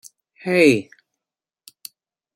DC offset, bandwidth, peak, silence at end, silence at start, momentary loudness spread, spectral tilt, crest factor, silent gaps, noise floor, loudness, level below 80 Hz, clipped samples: under 0.1%; 16.5 kHz; -2 dBFS; 1.55 s; 0.45 s; 25 LU; -5 dB/octave; 20 dB; none; -88 dBFS; -17 LUFS; -66 dBFS; under 0.1%